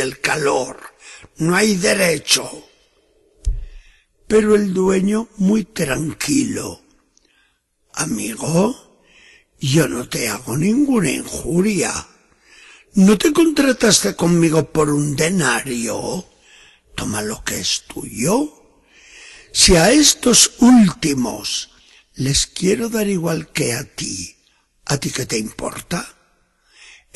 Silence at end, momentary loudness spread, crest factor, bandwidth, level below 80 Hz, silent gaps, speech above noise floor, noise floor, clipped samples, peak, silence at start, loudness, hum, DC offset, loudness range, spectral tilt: 1.05 s; 16 LU; 18 dB; 13 kHz; -38 dBFS; none; 46 dB; -63 dBFS; under 0.1%; 0 dBFS; 0 s; -17 LUFS; none; under 0.1%; 9 LU; -4 dB/octave